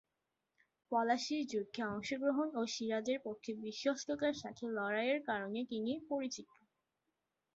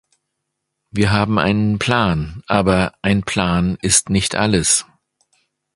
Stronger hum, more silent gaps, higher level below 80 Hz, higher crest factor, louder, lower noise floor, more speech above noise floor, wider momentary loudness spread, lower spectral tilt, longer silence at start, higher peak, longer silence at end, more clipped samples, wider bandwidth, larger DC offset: neither; neither; second, -78 dBFS vs -38 dBFS; about the same, 18 dB vs 18 dB; second, -38 LUFS vs -17 LUFS; first, -88 dBFS vs -76 dBFS; second, 50 dB vs 60 dB; about the same, 7 LU vs 5 LU; second, -2.5 dB/octave vs -4 dB/octave; about the same, 0.9 s vs 0.95 s; second, -20 dBFS vs 0 dBFS; first, 1.1 s vs 0.95 s; neither; second, 8 kHz vs 11.5 kHz; neither